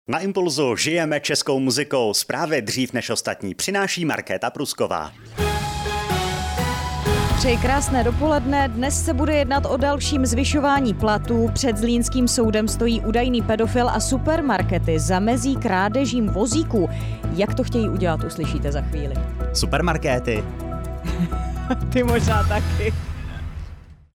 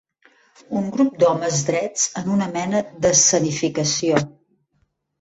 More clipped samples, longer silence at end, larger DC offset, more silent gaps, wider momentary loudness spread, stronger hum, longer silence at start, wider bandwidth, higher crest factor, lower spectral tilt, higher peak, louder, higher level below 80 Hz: neither; second, 0.25 s vs 0.9 s; neither; neither; about the same, 7 LU vs 9 LU; neither; second, 0.1 s vs 0.7 s; first, 17.5 kHz vs 8.2 kHz; second, 12 dB vs 18 dB; first, -5 dB/octave vs -3.5 dB/octave; second, -8 dBFS vs -2 dBFS; about the same, -21 LUFS vs -19 LUFS; first, -30 dBFS vs -58 dBFS